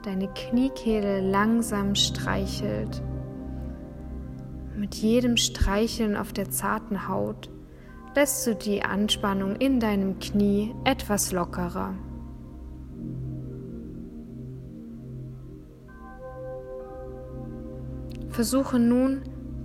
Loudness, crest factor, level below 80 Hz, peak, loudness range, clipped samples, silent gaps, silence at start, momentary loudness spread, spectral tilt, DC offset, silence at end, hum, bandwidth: -26 LUFS; 22 dB; -40 dBFS; -6 dBFS; 14 LU; under 0.1%; none; 0 s; 18 LU; -4.5 dB/octave; under 0.1%; 0 s; none; 16 kHz